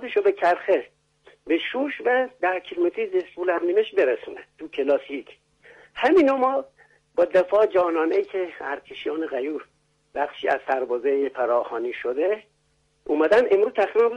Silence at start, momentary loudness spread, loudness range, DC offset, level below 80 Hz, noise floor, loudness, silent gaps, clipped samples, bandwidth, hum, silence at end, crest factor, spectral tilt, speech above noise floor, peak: 0 s; 12 LU; 4 LU; under 0.1%; -66 dBFS; -67 dBFS; -23 LUFS; none; under 0.1%; 9 kHz; none; 0 s; 14 dB; -5 dB/octave; 44 dB; -10 dBFS